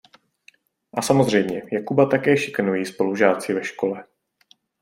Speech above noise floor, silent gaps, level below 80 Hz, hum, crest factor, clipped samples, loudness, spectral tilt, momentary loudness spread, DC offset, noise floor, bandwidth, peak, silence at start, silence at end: 39 dB; none; -62 dBFS; none; 20 dB; under 0.1%; -21 LUFS; -5.5 dB/octave; 9 LU; under 0.1%; -59 dBFS; 16 kHz; -2 dBFS; 0.95 s; 0.8 s